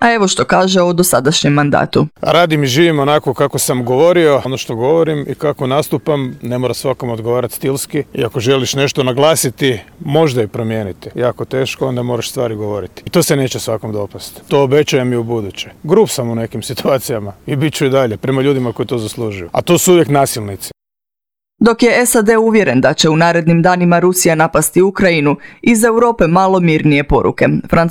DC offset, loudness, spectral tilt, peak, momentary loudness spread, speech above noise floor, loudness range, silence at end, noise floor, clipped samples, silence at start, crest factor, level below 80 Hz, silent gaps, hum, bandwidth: under 0.1%; -13 LUFS; -5 dB/octave; 0 dBFS; 10 LU; 73 dB; 6 LU; 0 s; -86 dBFS; under 0.1%; 0 s; 12 dB; -40 dBFS; none; none; over 20 kHz